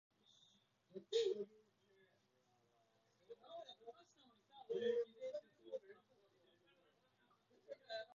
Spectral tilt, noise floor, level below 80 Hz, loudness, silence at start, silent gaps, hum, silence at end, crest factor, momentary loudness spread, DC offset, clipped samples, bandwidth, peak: -2 dB/octave; -80 dBFS; under -90 dBFS; -46 LUFS; 0.95 s; none; none; 0 s; 22 dB; 23 LU; under 0.1%; under 0.1%; 7.2 kHz; -28 dBFS